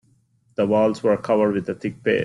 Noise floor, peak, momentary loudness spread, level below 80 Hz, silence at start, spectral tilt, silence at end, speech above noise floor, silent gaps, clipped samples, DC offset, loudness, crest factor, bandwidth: -61 dBFS; -8 dBFS; 8 LU; -60 dBFS; 0.6 s; -7 dB/octave; 0 s; 41 dB; none; under 0.1%; under 0.1%; -21 LUFS; 14 dB; 11 kHz